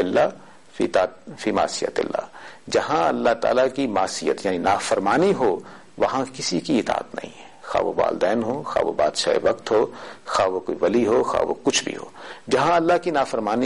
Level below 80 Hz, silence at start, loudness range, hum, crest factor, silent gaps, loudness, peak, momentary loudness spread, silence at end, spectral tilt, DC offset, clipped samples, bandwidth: -54 dBFS; 0 s; 2 LU; none; 14 dB; none; -22 LUFS; -8 dBFS; 11 LU; 0 s; -4 dB/octave; 0.3%; under 0.1%; 11.5 kHz